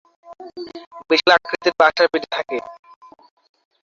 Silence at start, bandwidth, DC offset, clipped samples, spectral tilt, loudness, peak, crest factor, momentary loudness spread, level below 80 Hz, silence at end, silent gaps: 0.3 s; 7.4 kHz; under 0.1%; under 0.1%; -3 dB/octave; -17 LUFS; 0 dBFS; 20 dB; 23 LU; -64 dBFS; 1.15 s; 0.87-0.91 s